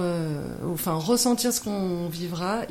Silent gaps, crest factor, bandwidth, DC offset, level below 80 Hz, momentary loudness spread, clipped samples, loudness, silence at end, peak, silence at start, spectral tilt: none; 16 dB; 16.5 kHz; under 0.1%; -54 dBFS; 9 LU; under 0.1%; -26 LUFS; 0 s; -10 dBFS; 0 s; -4.5 dB/octave